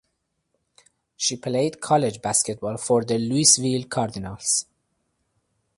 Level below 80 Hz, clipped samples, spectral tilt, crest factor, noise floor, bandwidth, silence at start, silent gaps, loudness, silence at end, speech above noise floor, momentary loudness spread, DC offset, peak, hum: -58 dBFS; under 0.1%; -3.5 dB/octave; 22 dB; -75 dBFS; 12 kHz; 1.2 s; none; -22 LUFS; 1.15 s; 52 dB; 11 LU; under 0.1%; -2 dBFS; none